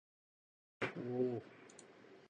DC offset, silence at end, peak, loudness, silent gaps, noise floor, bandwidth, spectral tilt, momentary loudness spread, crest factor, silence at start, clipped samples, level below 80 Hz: under 0.1%; 0 s; -24 dBFS; -42 LUFS; none; -61 dBFS; 9.6 kHz; -6.5 dB/octave; 20 LU; 20 dB; 0.8 s; under 0.1%; -82 dBFS